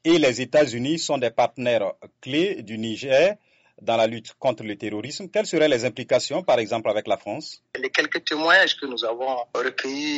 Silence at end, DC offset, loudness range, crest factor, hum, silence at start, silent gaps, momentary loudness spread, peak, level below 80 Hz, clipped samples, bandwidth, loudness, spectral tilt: 0 s; under 0.1%; 3 LU; 20 dB; none; 0.05 s; none; 11 LU; -4 dBFS; -66 dBFS; under 0.1%; 8 kHz; -23 LUFS; -2.5 dB/octave